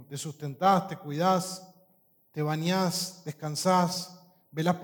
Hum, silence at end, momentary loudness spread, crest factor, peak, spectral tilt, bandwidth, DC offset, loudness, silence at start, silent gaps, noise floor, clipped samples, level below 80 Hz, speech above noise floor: none; 0 s; 14 LU; 18 dB; -10 dBFS; -5 dB/octave; 19 kHz; under 0.1%; -29 LUFS; 0 s; none; -66 dBFS; under 0.1%; -74 dBFS; 38 dB